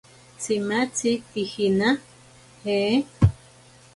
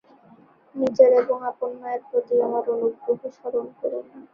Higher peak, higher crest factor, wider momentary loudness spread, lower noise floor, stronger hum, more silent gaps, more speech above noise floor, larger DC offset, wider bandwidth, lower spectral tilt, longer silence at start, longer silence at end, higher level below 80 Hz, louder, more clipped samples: about the same, -4 dBFS vs -2 dBFS; about the same, 20 dB vs 20 dB; second, 8 LU vs 14 LU; about the same, -51 dBFS vs -53 dBFS; neither; neither; about the same, 28 dB vs 31 dB; neither; first, 11.5 kHz vs 6.4 kHz; second, -5.5 dB/octave vs -7 dB/octave; second, 0.4 s vs 0.75 s; first, 0.6 s vs 0.15 s; first, -42 dBFS vs -70 dBFS; about the same, -24 LUFS vs -23 LUFS; neither